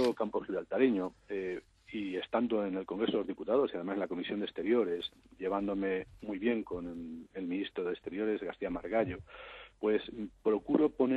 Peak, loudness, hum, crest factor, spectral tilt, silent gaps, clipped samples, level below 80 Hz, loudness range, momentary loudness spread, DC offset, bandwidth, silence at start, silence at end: -14 dBFS; -35 LUFS; none; 20 dB; -7 dB/octave; none; under 0.1%; -62 dBFS; 3 LU; 12 LU; under 0.1%; 10.5 kHz; 0 s; 0 s